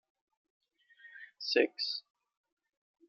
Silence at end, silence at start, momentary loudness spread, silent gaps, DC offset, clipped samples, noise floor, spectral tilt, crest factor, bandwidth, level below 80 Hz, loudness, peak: 1.1 s; 1.05 s; 22 LU; none; under 0.1%; under 0.1%; -57 dBFS; -1.5 dB/octave; 26 dB; 6.8 kHz; under -90 dBFS; -33 LUFS; -14 dBFS